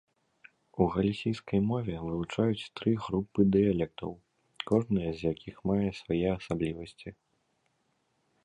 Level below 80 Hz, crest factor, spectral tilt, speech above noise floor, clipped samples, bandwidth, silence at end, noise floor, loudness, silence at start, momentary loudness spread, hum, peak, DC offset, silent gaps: -54 dBFS; 20 dB; -8 dB/octave; 46 dB; under 0.1%; 10 kHz; 1.3 s; -75 dBFS; -30 LUFS; 0.75 s; 15 LU; none; -12 dBFS; under 0.1%; none